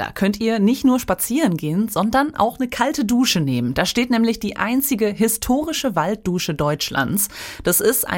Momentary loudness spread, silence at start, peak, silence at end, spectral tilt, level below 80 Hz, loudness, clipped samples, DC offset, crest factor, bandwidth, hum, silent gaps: 4 LU; 0 s; -2 dBFS; 0 s; -4 dB/octave; -44 dBFS; -19 LUFS; under 0.1%; under 0.1%; 16 dB; 17 kHz; none; none